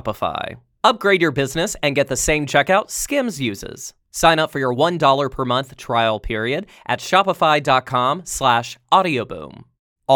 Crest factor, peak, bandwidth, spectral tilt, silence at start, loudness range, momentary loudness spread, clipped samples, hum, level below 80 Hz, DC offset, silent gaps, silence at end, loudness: 18 dB; 0 dBFS; 19 kHz; -3.5 dB/octave; 0.05 s; 1 LU; 12 LU; under 0.1%; none; -42 dBFS; under 0.1%; 9.79-9.96 s; 0 s; -18 LUFS